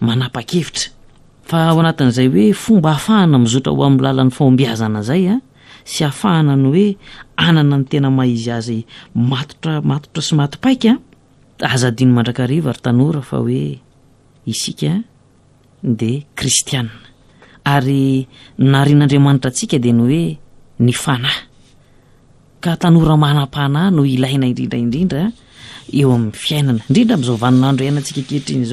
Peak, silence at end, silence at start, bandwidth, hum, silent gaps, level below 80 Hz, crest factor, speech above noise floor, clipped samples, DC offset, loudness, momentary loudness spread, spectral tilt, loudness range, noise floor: 0 dBFS; 0 s; 0 s; 13.5 kHz; none; none; -46 dBFS; 14 dB; 36 dB; under 0.1%; under 0.1%; -15 LUFS; 10 LU; -6 dB/octave; 6 LU; -50 dBFS